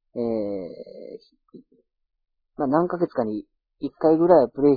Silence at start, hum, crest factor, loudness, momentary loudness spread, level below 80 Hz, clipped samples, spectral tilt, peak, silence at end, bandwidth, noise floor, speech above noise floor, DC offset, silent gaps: 0.15 s; none; 20 dB; -22 LUFS; 23 LU; -60 dBFS; under 0.1%; -11 dB/octave; -2 dBFS; 0 s; 4.9 kHz; -64 dBFS; 44 dB; under 0.1%; none